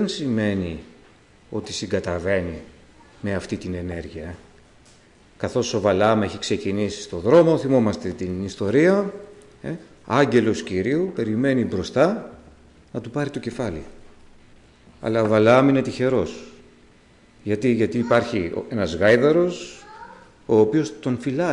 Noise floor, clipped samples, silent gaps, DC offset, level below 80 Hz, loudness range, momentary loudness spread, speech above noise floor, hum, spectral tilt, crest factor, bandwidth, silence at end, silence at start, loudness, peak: -53 dBFS; under 0.1%; none; under 0.1%; -54 dBFS; 8 LU; 18 LU; 32 dB; none; -6 dB/octave; 16 dB; 11 kHz; 0 s; 0 s; -21 LUFS; -6 dBFS